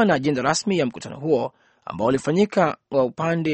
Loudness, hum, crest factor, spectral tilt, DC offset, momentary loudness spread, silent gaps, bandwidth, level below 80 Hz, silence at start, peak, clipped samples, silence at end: -22 LUFS; none; 18 dB; -5.5 dB/octave; under 0.1%; 11 LU; none; 8.8 kHz; -58 dBFS; 0 s; -4 dBFS; under 0.1%; 0 s